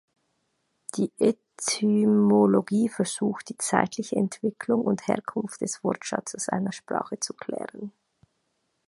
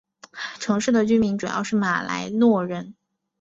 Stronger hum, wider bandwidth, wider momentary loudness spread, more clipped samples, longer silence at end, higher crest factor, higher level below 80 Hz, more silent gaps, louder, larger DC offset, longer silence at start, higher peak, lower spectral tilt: neither; first, 11.5 kHz vs 8 kHz; about the same, 13 LU vs 14 LU; neither; first, 1 s vs 0.5 s; first, 24 dB vs 16 dB; second, -70 dBFS vs -58 dBFS; neither; second, -26 LUFS vs -22 LUFS; neither; first, 0.95 s vs 0.35 s; first, -2 dBFS vs -8 dBFS; about the same, -5 dB/octave vs -5.5 dB/octave